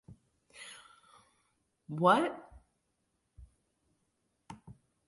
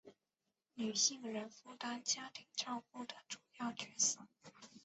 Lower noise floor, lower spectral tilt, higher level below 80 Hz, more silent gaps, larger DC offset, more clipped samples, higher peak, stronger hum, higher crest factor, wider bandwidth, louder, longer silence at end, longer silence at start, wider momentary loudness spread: second, -80 dBFS vs -90 dBFS; first, -6 dB/octave vs -1 dB/octave; first, -66 dBFS vs -88 dBFS; neither; neither; neither; first, -12 dBFS vs -20 dBFS; neither; about the same, 26 dB vs 24 dB; first, 11.5 kHz vs 8.2 kHz; first, -30 LUFS vs -40 LUFS; first, 0.35 s vs 0.05 s; about the same, 0.1 s vs 0.05 s; first, 27 LU vs 18 LU